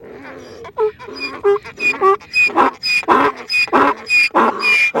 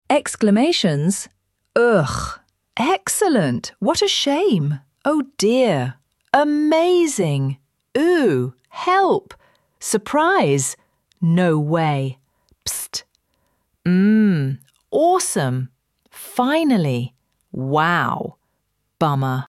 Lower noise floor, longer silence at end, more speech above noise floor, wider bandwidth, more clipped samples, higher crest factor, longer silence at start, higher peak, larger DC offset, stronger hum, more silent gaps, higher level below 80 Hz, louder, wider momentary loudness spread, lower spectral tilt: second, -34 dBFS vs -71 dBFS; about the same, 0 s vs 0.05 s; second, 17 dB vs 53 dB; first, 18 kHz vs 15 kHz; neither; about the same, 16 dB vs 18 dB; about the same, 0 s vs 0.1 s; about the same, 0 dBFS vs -2 dBFS; neither; neither; neither; about the same, -54 dBFS vs -52 dBFS; first, -14 LUFS vs -19 LUFS; first, 16 LU vs 13 LU; second, -3 dB/octave vs -5 dB/octave